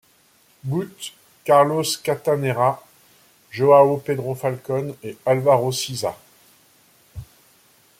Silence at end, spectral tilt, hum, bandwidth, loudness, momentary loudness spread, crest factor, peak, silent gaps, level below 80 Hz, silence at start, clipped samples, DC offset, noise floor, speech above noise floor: 0.75 s; -5 dB/octave; none; 16.5 kHz; -20 LUFS; 20 LU; 20 dB; -2 dBFS; none; -58 dBFS; 0.65 s; under 0.1%; under 0.1%; -57 dBFS; 38 dB